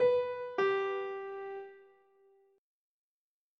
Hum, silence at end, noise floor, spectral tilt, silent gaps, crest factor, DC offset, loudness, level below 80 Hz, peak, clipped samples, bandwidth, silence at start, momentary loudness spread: none; 1.75 s; under -90 dBFS; -5.5 dB/octave; none; 16 dB; under 0.1%; -34 LUFS; -88 dBFS; -20 dBFS; under 0.1%; 6.4 kHz; 0 s; 14 LU